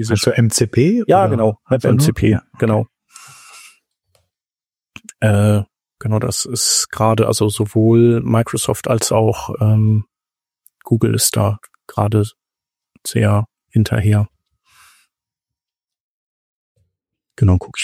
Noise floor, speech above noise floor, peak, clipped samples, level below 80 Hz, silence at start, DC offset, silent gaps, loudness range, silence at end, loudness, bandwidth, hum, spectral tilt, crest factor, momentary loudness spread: under -90 dBFS; over 75 dB; -2 dBFS; under 0.1%; -44 dBFS; 0 s; under 0.1%; 16.00-16.75 s; 7 LU; 0 s; -16 LUFS; 15.5 kHz; none; -5.5 dB/octave; 16 dB; 7 LU